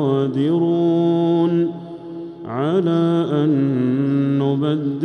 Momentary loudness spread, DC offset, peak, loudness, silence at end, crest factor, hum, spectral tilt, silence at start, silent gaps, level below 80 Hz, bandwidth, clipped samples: 13 LU; under 0.1%; -6 dBFS; -18 LUFS; 0 s; 12 dB; none; -9.5 dB/octave; 0 s; none; -62 dBFS; 6.2 kHz; under 0.1%